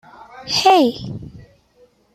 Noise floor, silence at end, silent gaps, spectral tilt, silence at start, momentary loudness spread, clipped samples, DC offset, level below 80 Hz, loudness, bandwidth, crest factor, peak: -55 dBFS; 0.75 s; none; -4 dB/octave; 0.35 s; 21 LU; under 0.1%; under 0.1%; -52 dBFS; -15 LUFS; 15.5 kHz; 18 dB; -2 dBFS